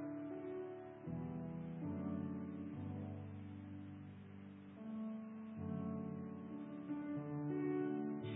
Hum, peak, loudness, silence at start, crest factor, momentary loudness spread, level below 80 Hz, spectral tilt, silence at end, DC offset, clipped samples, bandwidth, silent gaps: none; -30 dBFS; -47 LUFS; 0 s; 14 dB; 11 LU; -68 dBFS; -7.5 dB/octave; 0 s; under 0.1%; under 0.1%; 3.8 kHz; none